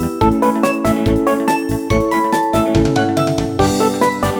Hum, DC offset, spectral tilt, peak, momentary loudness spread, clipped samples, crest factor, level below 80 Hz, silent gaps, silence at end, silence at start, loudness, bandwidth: none; under 0.1%; -6 dB/octave; 0 dBFS; 2 LU; under 0.1%; 14 dB; -30 dBFS; none; 0 s; 0 s; -15 LUFS; over 20 kHz